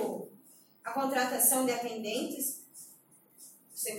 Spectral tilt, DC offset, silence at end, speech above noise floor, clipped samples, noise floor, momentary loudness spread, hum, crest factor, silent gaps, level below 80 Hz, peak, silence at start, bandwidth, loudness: -1.5 dB/octave; under 0.1%; 0 s; 30 dB; under 0.1%; -61 dBFS; 25 LU; none; 22 dB; none; -88 dBFS; -12 dBFS; 0 s; 17 kHz; -30 LUFS